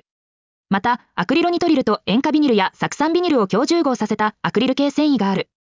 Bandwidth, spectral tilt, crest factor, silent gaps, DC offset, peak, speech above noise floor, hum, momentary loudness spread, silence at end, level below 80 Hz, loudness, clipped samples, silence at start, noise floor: 7.6 kHz; -5.5 dB/octave; 14 dB; none; under 0.1%; -4 dBFS; over 72 dB; none; 5 LU; 0.35 s; -58 dBFS; -18 LUFS; under 0.1%; 0.7 s; under -90 dBFS